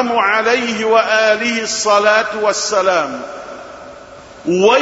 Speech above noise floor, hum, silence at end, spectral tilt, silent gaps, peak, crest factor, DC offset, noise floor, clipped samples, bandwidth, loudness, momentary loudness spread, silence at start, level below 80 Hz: 23 dB; none; 0 s; -2.5 dB/octave; none; 0 dBFS; 14 dB; under 0.1%; -37 dBFS; under 0.1%; 8 kHz; -14 LUFS; 19 LU; 0 s; -56 dBFS